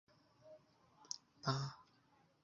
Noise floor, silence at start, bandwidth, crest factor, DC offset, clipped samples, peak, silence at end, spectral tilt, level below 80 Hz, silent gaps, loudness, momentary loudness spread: -74 dBFS; 0.45 s; 7.2 kHz; 26 dB; under 0.1%; under 0.1%; -24 dBFS; 0.6 s; -4.5 dB/octave; -80 dBFS; none; -45 LUFS; 22 LU